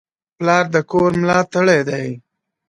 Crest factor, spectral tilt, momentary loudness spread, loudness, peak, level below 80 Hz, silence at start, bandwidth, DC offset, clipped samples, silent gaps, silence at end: 18 dB; -6 dB/octave; 10 LU; -16 LUFS; 0 dBFS; -52 dBFS; 0.4 s; 11 kHz; under 0.1%; under 0.1%; none; 0.5 s